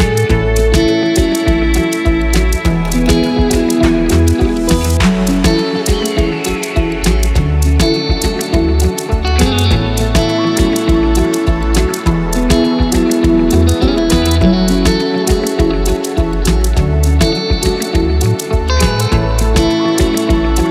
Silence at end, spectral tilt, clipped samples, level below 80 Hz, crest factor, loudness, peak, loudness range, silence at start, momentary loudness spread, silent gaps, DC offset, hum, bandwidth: 0 s; -5.5 dB/octave; under 0.1%; -16 dBFS; 12 dB; -13 LUFS; 0 dBFS; 2 LU; 0 s; 3 LU; none; under 0.1%; none; 16 kHz